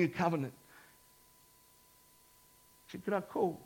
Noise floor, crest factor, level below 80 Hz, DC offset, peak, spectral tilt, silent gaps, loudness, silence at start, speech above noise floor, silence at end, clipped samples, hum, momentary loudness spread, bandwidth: -64 dBFS; 22 dB; -74 dBFS; under 0.1%; -18 dBFS; -7 dB/octave; none; -36 LUFS; 0 s; 30 dB; 0 s; under 0.1%; none; 26 LU; 17.5 kHz